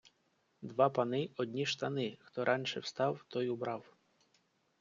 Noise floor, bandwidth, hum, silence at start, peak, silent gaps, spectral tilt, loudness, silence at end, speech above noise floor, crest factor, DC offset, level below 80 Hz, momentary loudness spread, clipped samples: -76 dBFS; 7.6 kHz; none; 0.05 s; -16 dBFS; none; -4 dB/octave; -36 LUFS; 1 s; 41 dB; 22 dB; under 0.1%; -80 dBFS; 9 LU; under 0.1%